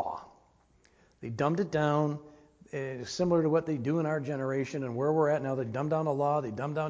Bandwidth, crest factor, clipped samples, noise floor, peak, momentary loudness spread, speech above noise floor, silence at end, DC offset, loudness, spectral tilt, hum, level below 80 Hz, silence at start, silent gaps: 8 kHz; 18 dB; under 0.1%; -65 dBFS; -12 dBFS; 11 LU; 35 dB; 0 s; under 0.1%; -30 LUFS; -7 dB/octave; none; -66 dBFS; 0 s; none